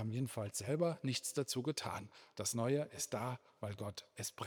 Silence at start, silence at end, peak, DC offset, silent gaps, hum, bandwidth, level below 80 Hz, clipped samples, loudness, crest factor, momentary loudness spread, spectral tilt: 0 s; 0 s; -22 dBFS; under 0.1%; none; none; over 20 kHz; -80 dBFS; under 0.1%; -40 LUFS; 18 dB; 10 LU; -4.5 dB/octave